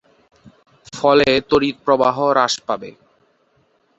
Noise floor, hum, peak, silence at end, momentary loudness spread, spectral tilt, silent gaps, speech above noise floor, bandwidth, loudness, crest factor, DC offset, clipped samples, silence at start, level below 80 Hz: -61 dBFS; none; -2 dBFS; 1.1 s; 12 LU; -4 dB/octave; none; 44 dB; 8.2 kHz; -17 LUFS; 18 dB; under 0.1%; under 0.1%; 0.95 s; -52 dBFS